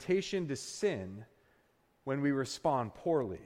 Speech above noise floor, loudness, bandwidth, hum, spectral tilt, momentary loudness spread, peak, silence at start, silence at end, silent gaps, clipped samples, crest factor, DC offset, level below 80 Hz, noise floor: 37 dB; -34 LUFS; 15.5 kHz; none; -5.5 dB/octave; 11 LU; -18 dBFS; 0 s; 0 s; none; under 0.1%; 16 dB; under 0.1%; -68 dBFS; -71 dBFS